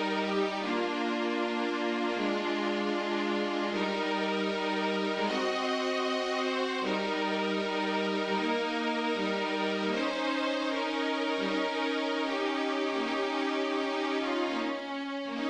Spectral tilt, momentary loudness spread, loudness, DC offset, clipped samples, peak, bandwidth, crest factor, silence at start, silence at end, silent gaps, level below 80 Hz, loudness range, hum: -4.5 dB/octave; 1 LU; -30 LUFS; under 0.1%; under 0.1%; -18 dBFS; 10.5 kHz; 12 dB; 0 s; 0 s; none; -70 dBFS; 0 LU; none